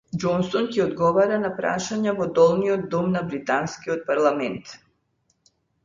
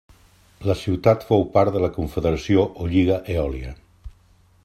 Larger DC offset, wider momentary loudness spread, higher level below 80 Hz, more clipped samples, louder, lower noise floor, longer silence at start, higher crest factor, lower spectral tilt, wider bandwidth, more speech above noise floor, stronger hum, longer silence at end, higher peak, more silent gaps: neither; about the same, 9 LU vs 9 LU; second, -58 dBFS vs -40 dBFS; neither; about the same, -23 LUFS vs -21 LUFS; first, -70 dBFS vs -56 dBFS; second, 0.15 s vs 0.6 s; about the same, 18 dB vs 20 dB; second, -6 dB/octave vs -8 dB/octave; second, 7.6 kHz vs 14 kHz; first, 48 dB vs 35 dB; neither; first, 1.1 s vs 0.55 s; second, -6 dBFS vs -2 dBFS; neither